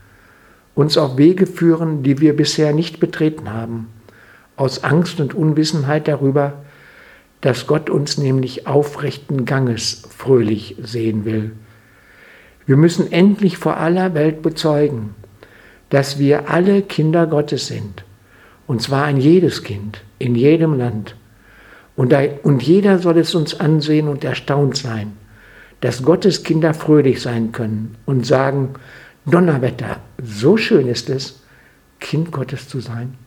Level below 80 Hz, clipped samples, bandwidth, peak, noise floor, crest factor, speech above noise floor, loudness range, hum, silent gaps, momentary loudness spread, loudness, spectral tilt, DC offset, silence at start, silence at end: -54 dBFS; under 0.1%; 14.5 kHz; 0 dBFS; -49 dBFS; 16 dB; 34 dB; 3 LU; none; none; 14 LU; -16 LUFS; -6.5 dB/octave; under 0.1%; 0.75 s; 0.1 s